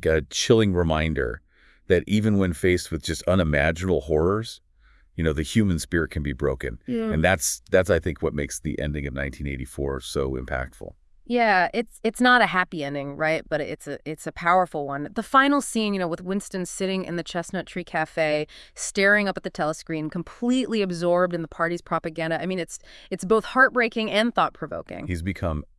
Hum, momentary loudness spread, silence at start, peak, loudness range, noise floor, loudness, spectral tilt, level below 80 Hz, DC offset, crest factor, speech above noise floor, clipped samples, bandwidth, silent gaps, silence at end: none; 13 LU; 0 s; -4 dBFS; 3 LU; -57 dBFS; -24 LUFS; -5 dB/octave; -42 dBFS; under 0.1%; 20 dB; 33 dB; under 0.1%; 12 kHz; none; 0.15 s